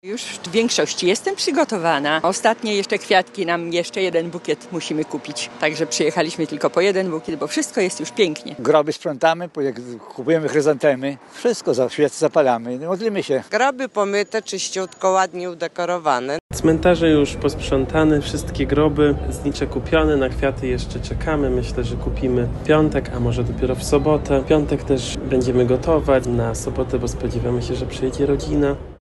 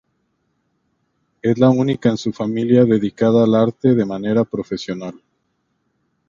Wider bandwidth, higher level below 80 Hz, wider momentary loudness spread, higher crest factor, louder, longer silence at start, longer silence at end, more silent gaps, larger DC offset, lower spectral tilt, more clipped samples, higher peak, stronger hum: first, 12.5 kHz vs 7.4 kHz; first, -34 dBFS vs -56 dBFS; second, 8 LU vs 12 LU; about the same, 20 dB vs 18 dB; second, -20 LUFS vs -17 LUFS; second, 0.05 s vs 1.45 s; second, 0.05 s vs 1.15 s; first, 16.40-16.49 s vs none; neither; second, -5 dB/octave vs -8 dB/octave; neither; about the same, 0 dBFS vs 0 dBFS; neither